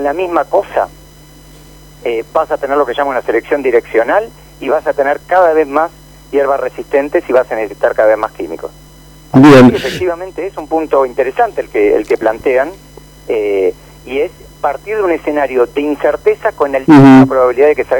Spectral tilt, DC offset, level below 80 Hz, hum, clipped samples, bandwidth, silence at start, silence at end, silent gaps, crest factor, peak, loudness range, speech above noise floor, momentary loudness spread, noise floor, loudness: -7 dB/octave; under 0.1%; -42 dBFS; none; under 0.1%; 19 kHz; 0 s; 0 s; none; 12 dB; 0 dBFS; 6 LU; 27 dB; 14 LU; -38 dBFS; -12 LUFS